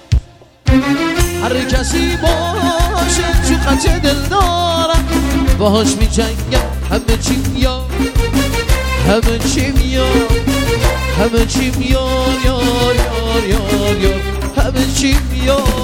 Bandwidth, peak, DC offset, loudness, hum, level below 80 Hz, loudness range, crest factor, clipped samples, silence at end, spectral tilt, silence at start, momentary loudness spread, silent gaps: 17 kHz; 0 dBFS; under 0.1%; -14 LUFS; none; -18 dBFS; 1 LU; 14 dB; under 0.1%; 0 s; -5 dB/octave; 0.1 s; 3 LU; none